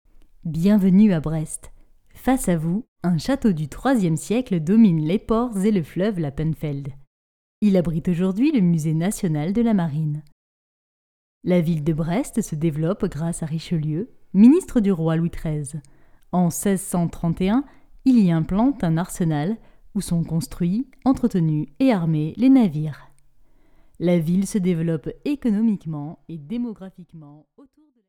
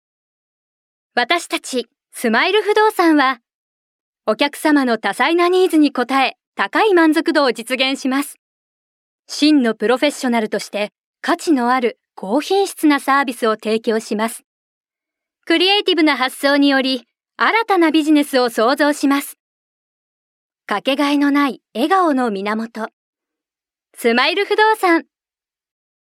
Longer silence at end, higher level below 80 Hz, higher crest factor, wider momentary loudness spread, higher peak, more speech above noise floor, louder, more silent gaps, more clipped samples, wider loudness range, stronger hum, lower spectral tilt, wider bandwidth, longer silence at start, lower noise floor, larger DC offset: second, 0.75 s vs 1 s; first, -44 dBFS vs -76 dBFS; about the same, 16 dB vs 18 dB; first, 13 LU vs 10 LU; second, -4 dBFS vs 0 dBFS; second, 31 dB vs over 74 dB; second, -21 LUFS vs -16 LUFS; second, 2.88-2.96 s, 7.07-7.62 s, 10.32-11.41 s vs 3.54-4.13 s, 6.47-6.53 s, 8.39-9.23 s, 10.99-11.14 s, 14.44-14.84 s, 19.40-20.50 s, 22.93-23.13 s; neither; about the same, 3 LU vs 4 LU; neither; first, -7.5 dB/octave vs -3 dB/octave; about the same, 16 kHz vs 16 kHz; second, 0.45 s vs 1.15 s; second, -51 dBFS vs under -90 dBFS; neither